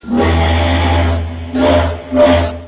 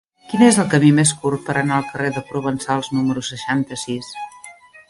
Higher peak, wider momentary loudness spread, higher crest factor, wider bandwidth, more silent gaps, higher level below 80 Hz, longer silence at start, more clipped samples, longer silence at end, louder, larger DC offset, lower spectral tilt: about the same, 0 dBFS vs 0 dBFS; second, 6 LU vs 13 LU; second, 12 dB vs 18 dB; second, 4 kHz vs 11.5 kHz; neither; first, -18 dBFS vs -56 dBFS; second, 0.05 s vs 0.3 s; neither; second, 0 s vs 0.35 s; first, -13 LUFS vs -18 LUFS; neither; first, -11 dB/octave vs -5 dB/octave